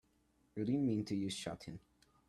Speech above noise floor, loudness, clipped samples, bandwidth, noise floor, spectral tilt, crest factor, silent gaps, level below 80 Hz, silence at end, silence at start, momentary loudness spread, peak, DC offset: 37 dB; -39 LUFS; under 0.1%; 13 kHz; -75 dBFS; -6 dB/octave; 16 dB; none; -72 dBFS; 0.5 s; 0.55 s; 16 LU; -26 dBFS; under 0.1%